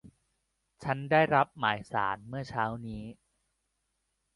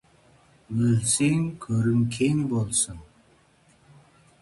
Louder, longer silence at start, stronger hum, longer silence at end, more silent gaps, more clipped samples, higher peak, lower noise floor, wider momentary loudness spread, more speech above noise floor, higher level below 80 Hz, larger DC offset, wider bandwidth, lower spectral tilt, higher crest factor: second, -30 LUFS vs -24 LUFS; second, 0.05 s vs 0.7 s; neither; second, 1.2 s vs 1.4 s; neither; neither; about the same, -10 dBFS vs -10 dBFS; first, -80 dBFS vs -60 dBFS; first, 16 LU vs 7 LU; first, 50 dB vs 36 dB; second, -62 dBFS vs -54 dBFS; neither; about the same, 11.5 kHz vs 11.5 kHz; first, -6.5 dB/octave vs -5 dB/octave; first, 22 dB vs 16 dB